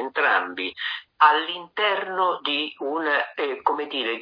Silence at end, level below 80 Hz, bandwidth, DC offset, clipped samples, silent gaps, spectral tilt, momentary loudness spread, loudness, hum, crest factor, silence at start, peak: 0 s; -80 dBFS; 5.2 kHz; under 0.1%; under 0.1%; none; -4.5 dB/octave; 10 LU; -23 LUFS; none; 20 dB; 0 s; -4 dBFS